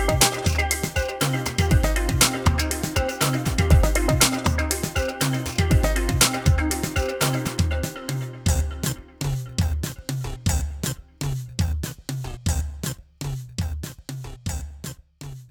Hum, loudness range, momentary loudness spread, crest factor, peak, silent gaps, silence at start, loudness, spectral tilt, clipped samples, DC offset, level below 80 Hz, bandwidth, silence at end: none; 9 LU; 13 LU; 20 dB; -2 dBFS; none; 0 s; -23 LUFS; -4 dB/octave; under 0.1%; under 0.1%; -28 dBFS; over 20 kHz; 0.05 s